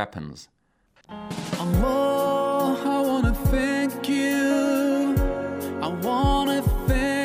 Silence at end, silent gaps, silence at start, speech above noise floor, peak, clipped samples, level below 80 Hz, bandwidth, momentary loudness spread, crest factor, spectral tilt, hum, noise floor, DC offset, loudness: 0 s; none; 0 s; 39 dB; -8 dBFS; under 0.1%; -32 dBFS; 16 kHz; 10 LU; 14 dB; -6 dB/octave; none; -63 dBFS; under 0.1%; -23 LUFS